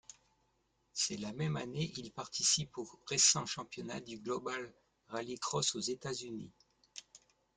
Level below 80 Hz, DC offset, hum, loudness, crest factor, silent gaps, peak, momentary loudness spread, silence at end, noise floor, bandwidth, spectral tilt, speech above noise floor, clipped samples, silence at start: -72 dBFS; under 0.1%; none; -35 LUFS; 24 dB; none; -14 dBFS; 20 LU; 0.4 s; -78 dBFS; 11 kHz; -2.5 dB/octave; 40 dB; under 0.1%; 0.1 s